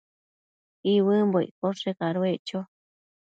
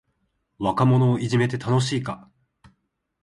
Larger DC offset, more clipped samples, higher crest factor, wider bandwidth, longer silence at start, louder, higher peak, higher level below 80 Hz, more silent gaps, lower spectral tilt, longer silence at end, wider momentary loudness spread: neither; neither; about the same, 16 dB vs 16 dB; second, 7.8 kHz vs 11 kHz; first, 0.85 s vs 0.6 s; second, -26 LUFS vs -22 LUFS; second, -12 dBFS vs -6 dBFS; second, -76 dBFS vs -56 dBFS; first, 1.51-1.62 s, 2.39-2.45 s vs none; about the same, -7.5 dB/octave vs -6.5 dB/octave; second, 0.6 s vs 1.05 s; about the same, 13 LU vs 11 LU